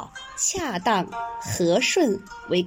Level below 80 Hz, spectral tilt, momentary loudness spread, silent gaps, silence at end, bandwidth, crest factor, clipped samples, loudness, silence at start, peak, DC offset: -56 dBFS; -3.5 dB/octave; 11 LU; none; 0 s; 16 kHz; 16 dB; under 0.1%; -23 LUFS; 0 s; -8 dBFS; under 0.1%